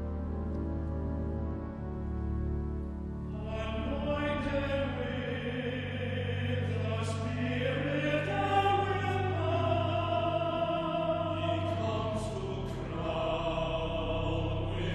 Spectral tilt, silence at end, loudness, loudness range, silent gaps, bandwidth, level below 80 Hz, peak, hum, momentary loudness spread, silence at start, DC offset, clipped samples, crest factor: -7 dB/octave; 0 s; -33 LUFS; 6 LU; none; 10.5 kHz; -42 dBFS; -16 dBFS; none; 7 LU; 0 s; under 0.1%; under 0.1%; 16 dB